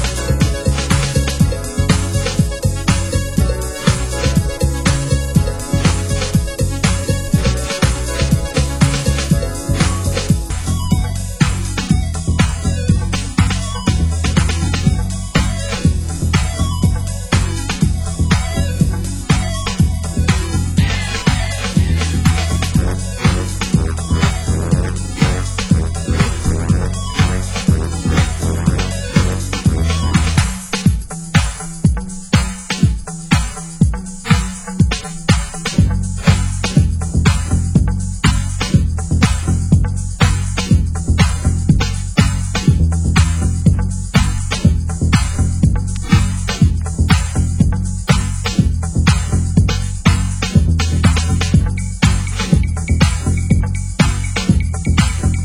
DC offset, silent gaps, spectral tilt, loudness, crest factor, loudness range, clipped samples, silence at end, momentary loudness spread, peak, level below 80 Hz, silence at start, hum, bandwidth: under 0.1%; none; -5 dB/octave; -16 LUFS; 14 dB; 2 LU; under 0.1%; 0 s; 4 LU; 0 dBFS; -20 dBFS; 0 s; none; 16 kHz